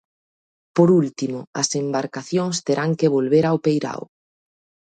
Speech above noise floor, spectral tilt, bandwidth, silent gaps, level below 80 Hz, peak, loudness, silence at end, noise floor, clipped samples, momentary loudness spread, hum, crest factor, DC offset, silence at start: over 70 dB; -5.5 dB/octave; 9.2 kHz; 1.47-1.53 s; -66 dBFS; -4 dBFS; -20 LUFS; 0.9 s; under -90 dBFS; under 0.1%; 10 LU; none; 18 dB; under 0.1%; 0.75 s